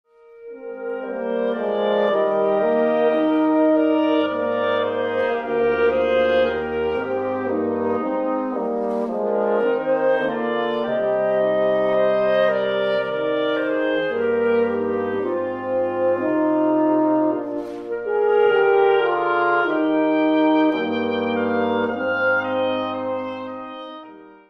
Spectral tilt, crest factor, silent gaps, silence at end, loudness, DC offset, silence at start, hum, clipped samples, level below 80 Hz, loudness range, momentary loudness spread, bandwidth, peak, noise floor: -7.5 dB/octave; 14 dB; none; 0.2 s; -20 LUFS; under 0.1%; 0.35 s; none; under 0.1%; -56 dBFS; 3 LU; 8 LU; 6 kHz; -6 dBFS; -42 dBFS